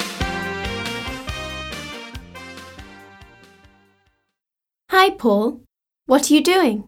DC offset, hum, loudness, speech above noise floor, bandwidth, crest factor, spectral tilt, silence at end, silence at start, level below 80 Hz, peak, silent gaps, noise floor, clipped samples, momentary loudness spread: under 0.1%; none; -19 LUFS; 70 dB; 17.5 kHz; 20 dB; -4 dB/octave; 0.05 s; 0 s; -42 dBFS; -2 dBFS; none; -87 dBFS; under 0.1%; 23 LU